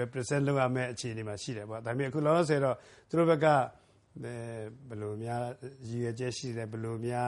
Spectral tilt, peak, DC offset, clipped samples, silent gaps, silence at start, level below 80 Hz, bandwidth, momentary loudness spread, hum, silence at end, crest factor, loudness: -6 dB/octave; -12 dBFS; under 0.1%; under 0.1%; none; 0 s; -68 dBFS; 11.5 kHz; 14 LU; none; 0 s; 20 dB; -32 LUFS